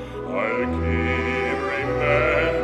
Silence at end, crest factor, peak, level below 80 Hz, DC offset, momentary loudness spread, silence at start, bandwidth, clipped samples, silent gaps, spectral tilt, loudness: 0 s; 16 dB; -8 dBFS; -36 dBFS; under 0.1%; 5 LU; 0 s; 10.5 kHz; under 0.1%; none; -7 dB/octave; -22 LUFS